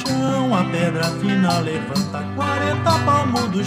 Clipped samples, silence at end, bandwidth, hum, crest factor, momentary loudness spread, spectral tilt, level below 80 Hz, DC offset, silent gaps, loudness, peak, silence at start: under 0.1%; 0 s; 15.5 kHz; none; 14 dB; 6 LU; -5.5 dB/octave; -52 dBFS; under 0.1%; none; -20 LUFS; -6 dBFS; 0 s